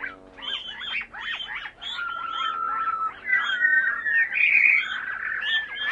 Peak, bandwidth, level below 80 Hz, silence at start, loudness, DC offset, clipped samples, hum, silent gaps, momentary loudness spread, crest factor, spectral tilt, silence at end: -4 dBFS; 8.8 kHz; -62 dBFS; 0 s; -23 LUFS; under 0.1%; under 0.1%; none; none; 14 LU; 22 dB; -0.5 dB/octave; 0 s